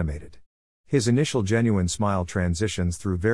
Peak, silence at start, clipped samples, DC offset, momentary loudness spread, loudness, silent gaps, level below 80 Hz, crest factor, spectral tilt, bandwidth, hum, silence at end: -8 dBFS; 0 s; under 0.1%; 0.3%; 5 LU; -24 LUFS; 0.46-0.84 s; -44 dBFS; 16 dB; -5.5 dB/octave; 12 kHz; none; 0 s